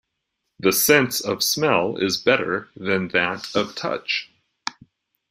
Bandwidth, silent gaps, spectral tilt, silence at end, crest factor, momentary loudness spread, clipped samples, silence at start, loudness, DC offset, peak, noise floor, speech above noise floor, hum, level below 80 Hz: 16 kHz; none; -3 dB/octave; 0.6 s; 22 dB; 11 LU; under 0.1%; 0.6 s; -21 LUFS; under 0.1%; -2 dBFS; -78 dBFS; 56 dB; none; -62 dBFS